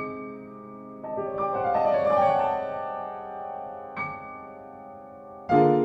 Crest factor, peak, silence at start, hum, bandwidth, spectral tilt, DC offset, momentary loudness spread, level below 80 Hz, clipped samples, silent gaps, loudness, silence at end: 20 dB; -6 dBFS; 0 s; none; 7.8 kHz; -8.5 dB/octave; under 0.1%; 21 LU; -62 dBFS; under 0.1%; none; -27 LUFS; 0 s